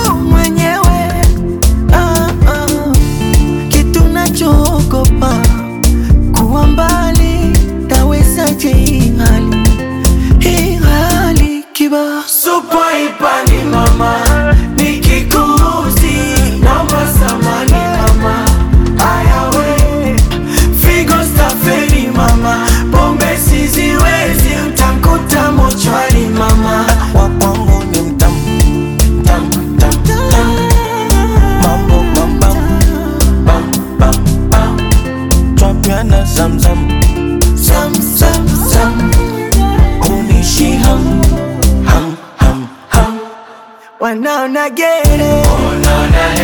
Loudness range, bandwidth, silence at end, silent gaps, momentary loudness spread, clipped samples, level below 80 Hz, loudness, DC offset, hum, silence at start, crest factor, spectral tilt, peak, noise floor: 1 LU; 19 kHz; 0 s; none; 3 LU; under 0.1%; -12 dBFS; -10 LUFS; under 0.1%; none; 0 s; 8 dB; -5 dB/octave; 0 dBFS; -35 dBFS